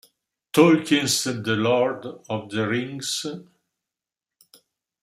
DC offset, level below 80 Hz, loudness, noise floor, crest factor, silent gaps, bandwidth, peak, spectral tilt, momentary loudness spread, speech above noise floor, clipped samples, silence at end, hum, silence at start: under 0.1%; -68 dBFS; -22 LUFS; -89 dBFS; 22 dB; none; 15.5 kHz; -2 dBFS; -4 dB/octave; 15 LU; 67 dB; under 0.1%; 1.6 s; none; 0.55 s